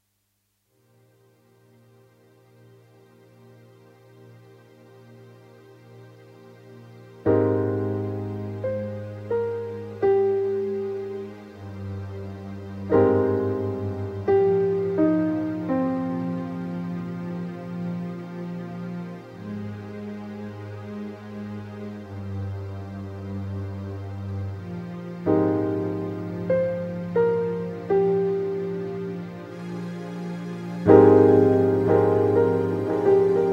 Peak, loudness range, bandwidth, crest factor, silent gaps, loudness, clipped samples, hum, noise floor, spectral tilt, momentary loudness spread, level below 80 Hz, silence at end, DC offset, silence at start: 0 dBFS; 15 LU; 6.6 kHz; 24 dB; none; -24 LUFS; under 0.1%; none; -72 dBFS; -9.5 dB/octave; 16 LU; -60 dBFS; 0 s; under 0.1%; 4.2 s